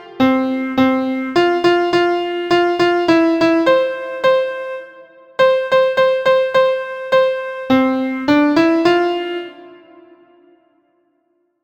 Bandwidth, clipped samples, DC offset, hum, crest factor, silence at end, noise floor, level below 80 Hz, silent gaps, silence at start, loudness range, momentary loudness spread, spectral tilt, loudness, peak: 8.8 kHz; under 0.1%; under 0.1%; none; 16 dB; 1.9 s; -64 dBFS; -56 dBFS; none; 0 s; 3 LU; 9 LU; -5.5 dB/octave; -15 LUFS; 0 dBFS